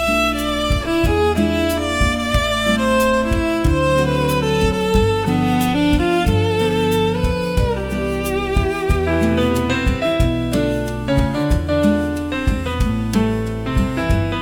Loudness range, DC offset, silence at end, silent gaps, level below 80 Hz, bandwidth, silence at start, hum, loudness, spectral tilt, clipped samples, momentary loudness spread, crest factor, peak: 2 LU; under 0.1%; 0 s; none; -26 dBFS; 17.5 kHz; 0 s; none; -18 LUFS; -6 dB/octave; under 0.1%; 4 LU; 14 dB; -2 dBFS